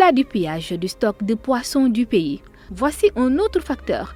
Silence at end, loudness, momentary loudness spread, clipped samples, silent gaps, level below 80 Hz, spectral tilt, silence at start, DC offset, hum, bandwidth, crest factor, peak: 0 s; -20 LUFS; 8 LU; under 0.1%; none; -42 dBFS; -5.5 dB/octave; 0 s; under 0.1%; none; 16 kHz; 18 dB; -2 dBFS